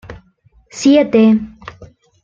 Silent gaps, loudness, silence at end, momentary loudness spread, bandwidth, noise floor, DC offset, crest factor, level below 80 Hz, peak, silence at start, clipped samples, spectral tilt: none; -12 LUFS; 0.4 s; 24 LU; 7.6 kHz; -52 dBFS; under 0.1%; 14 dB; -48 dBFS; -2 dBFS; 0.1 s; under 0.1%; -5.5 dB/octave